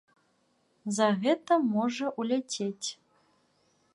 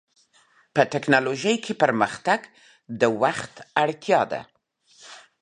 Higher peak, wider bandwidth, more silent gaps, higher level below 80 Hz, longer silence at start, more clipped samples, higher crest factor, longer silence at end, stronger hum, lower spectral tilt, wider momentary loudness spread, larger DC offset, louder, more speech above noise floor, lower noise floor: second, -12 dBFS vs -2 dBFS; about the same, 11.5 kHz vs 10.5 kHz; neither; second, -80 dBFS vs -68 dBFS; about the same, 0.85 s vs 0.75 s; neither; about the same, 20 dB vs 22 dB; first, 1 s vs 0.2 s; neither; about the same, -4.5 dB/octave vs -4.5 dB/octave; second, 11 LU vs 14 LU; neither; second, -29 LUFS vs -23 LUFS; first, 43 dB vs 38 dB; first, -71 dBFS vs -60 dBFS